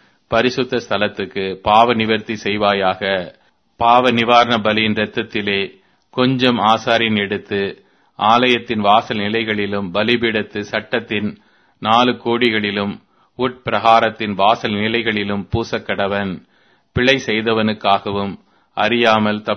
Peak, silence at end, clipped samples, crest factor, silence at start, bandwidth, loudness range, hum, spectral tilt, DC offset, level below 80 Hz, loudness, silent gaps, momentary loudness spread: 0 dBFS; 0 s; under 0.1%; 18 dB; 0.3 s; 6.6 kHz; 3 LU; none; -5.5 dB/octave; under 0.1%; -50 dBFS; -17 LUFS; none; 10 LU